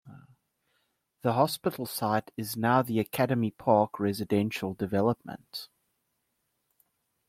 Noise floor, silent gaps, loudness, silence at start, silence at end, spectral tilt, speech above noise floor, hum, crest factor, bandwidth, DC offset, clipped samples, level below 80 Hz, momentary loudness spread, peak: -79 dBFS; none; -28 LUFS; 0.05 s; 1.65 s; -6 dB/octave; 50 dB; none; 22 dB; 16.5 kHz; under 0.1%; under 0.1%; -68 dBFS; 12 LU; -8 dBFS